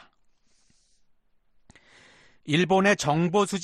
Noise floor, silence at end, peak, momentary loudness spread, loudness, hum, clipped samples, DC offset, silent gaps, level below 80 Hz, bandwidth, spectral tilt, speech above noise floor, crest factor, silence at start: -63 dBFS; 0 s; -8 dBFS; 6 LU; -23 LUFS; none; under 0.1%; under 0.1%; none; -62 dBFS; 13 kHz; -5 dB/octave; 40 dB; 20 dB; 2.45 s